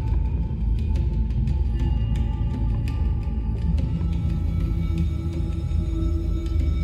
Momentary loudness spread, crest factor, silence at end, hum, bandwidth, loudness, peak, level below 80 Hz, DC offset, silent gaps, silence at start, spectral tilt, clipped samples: 2 LU; 10 dB; 0 s; none; 7 kHz; -25 LUFS; -12 dBFS; -24 dBFS; under 0.1%; none; 0 s; -9 dB/octave; under 0.1%